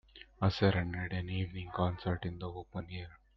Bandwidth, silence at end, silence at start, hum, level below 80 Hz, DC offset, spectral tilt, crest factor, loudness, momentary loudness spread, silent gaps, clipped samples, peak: 6.2 kHz; 0.2 s; 0.15 s; none; -56 dBFS; under 0.1%; -5.5 dB/octave; 20 dB; -36 LUFS; 14 LU; none; under 0.1%; -16 dBFS